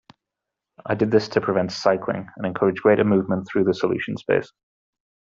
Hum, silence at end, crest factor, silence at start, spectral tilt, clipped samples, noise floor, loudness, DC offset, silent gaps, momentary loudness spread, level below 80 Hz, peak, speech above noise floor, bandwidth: none; 0.9 s; 20 dB; 0.85 s; -7 dB/octave; under 0.1%; -85 dBFS; -22 LUFS; under 0.1%; none; 10 LU; -60 dBFS; -4 dBFS; 64 dB; 7.6 kHz